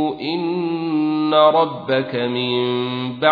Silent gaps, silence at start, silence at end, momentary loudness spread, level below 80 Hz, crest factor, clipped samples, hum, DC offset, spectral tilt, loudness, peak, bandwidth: none; 0 s; 0 s; 8 LU; -64 dBFS; 18 dB; under 0.1%; none; under 0.1%; -8.5 dB/octave; -19 LUFS; -2 dBFS; 5 kHz